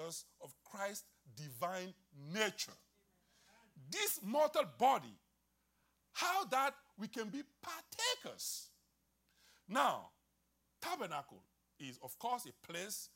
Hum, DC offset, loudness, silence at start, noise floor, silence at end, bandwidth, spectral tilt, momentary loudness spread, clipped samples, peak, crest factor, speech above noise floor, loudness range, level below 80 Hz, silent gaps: none; under 0.1%; -40 LUFS; 0 s; -80 dBFS; 0.1 s; 16 kHz; -2.5 dB/octave; 18 LU; under 0.1%; -20 dBFS; 22 dB; 40 dB; 6 LU; -86 dBFS; none